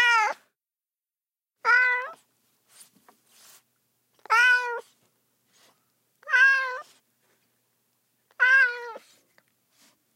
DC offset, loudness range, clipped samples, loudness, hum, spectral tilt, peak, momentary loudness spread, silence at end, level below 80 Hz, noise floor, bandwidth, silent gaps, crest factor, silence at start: under 0.1%; 4 LU; under 0.1%; -21 LUFS; none; 2.5 dB/octave; -10 dBFS; 20 LU; 1.2 s; under -90 dBFS; under -90 dBFS; 16 kHz; none; 18 dB; 0 s